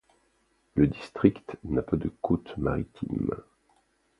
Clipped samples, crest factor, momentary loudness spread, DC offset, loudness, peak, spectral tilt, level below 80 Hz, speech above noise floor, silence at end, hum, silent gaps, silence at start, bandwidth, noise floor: under 0.1%; 24 dB; 8 LU; under 0.1%; -29 LUFS; -4 dBFS; -9.5 dB/octave; -46 dBFS; 42 dB; 0.8 s; none; none; 0.75 s; 10 kHz; -70 dBFS